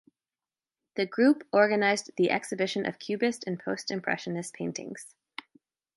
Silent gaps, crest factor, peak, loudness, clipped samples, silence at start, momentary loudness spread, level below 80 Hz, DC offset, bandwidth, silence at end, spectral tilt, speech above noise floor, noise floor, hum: none; 20 dB; -10 dBFS; -28 LUFS; under 0.1%; 0.95 s; 19 LU; -78 dBFS; under 0.1%; 11.5 kHz; 0.9 s; -4.5 dB/octave; over 62 dB; under -90 dBFS; none